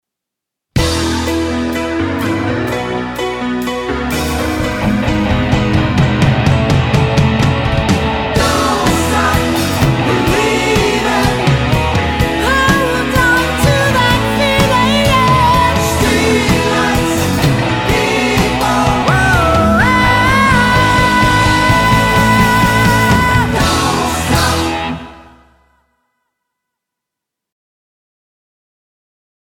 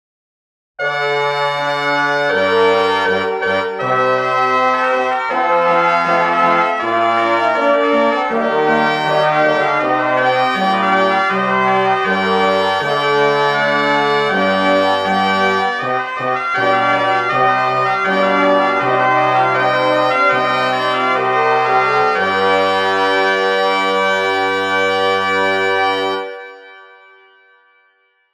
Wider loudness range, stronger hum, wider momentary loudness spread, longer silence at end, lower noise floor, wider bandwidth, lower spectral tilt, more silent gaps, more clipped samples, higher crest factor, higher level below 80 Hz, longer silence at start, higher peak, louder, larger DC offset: first, 7 LU vs 2 LU; neither; first, 7 LU vs 4 LU; first, 4.35 s vs 1.5 s; first, -81 dBFS vs -58 dBFS; first, 18.5 kHz vs 12 kHz; about the same, -5 dB/octave vs -4.5 dB/octave; neither; neither; about the same, 12 dB vs 14 dB; first, -26 dBFS vs -60 dBFS; about the same, 0.75 s vs 0.8 s; about the same, 0 dBFS vs -2 dBFS; about the same, -12 LUFS vs -14 LUFS; neither